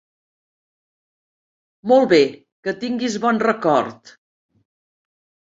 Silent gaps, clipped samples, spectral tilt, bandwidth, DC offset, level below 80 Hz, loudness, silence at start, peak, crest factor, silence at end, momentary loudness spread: 2.52-2.63 s; under 0.1%; -5 dB/octave; 7.8 kHz; under 0.1%; -66 dBFS; -18 LUFS; 1.85 s; -2 dBFS; 20 dB; 1.55 s; 15 LU